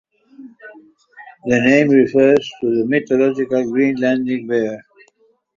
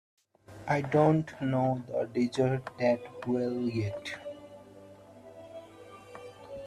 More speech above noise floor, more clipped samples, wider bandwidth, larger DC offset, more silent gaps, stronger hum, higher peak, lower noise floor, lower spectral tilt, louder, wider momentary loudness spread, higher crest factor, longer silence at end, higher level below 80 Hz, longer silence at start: first, 43 dB vs 23 dB; neither; second, 7.4 kHz vs 12.5 kHz; neither; neither; neither; first, -2 dBFS vs -12 dBFS; first, -58 dBFS vs -52 dBFS; about the same, -6.5 dB/octave vs -7.5 dB/octave; first, -16 LUFS vs -30 LUFS; second, 8 LU vs 23 LU; about the same, 16 dB vs 20 dB; first, 0.8 s vs 0 s; first, -58 dBFS vs -64 dBFS; about the same, 0.4 s vs 0.5 s